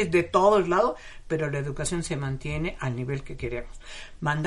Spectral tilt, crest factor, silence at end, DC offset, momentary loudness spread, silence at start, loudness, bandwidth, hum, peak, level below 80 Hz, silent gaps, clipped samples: -5.5 dB/octave; 18 dB; 0 s; under 0.1%; 17 LU; 0 s; -27 LUFS; 11.5 kHz; none; -8 dBFS; -42 dBFS; none; under 0.1%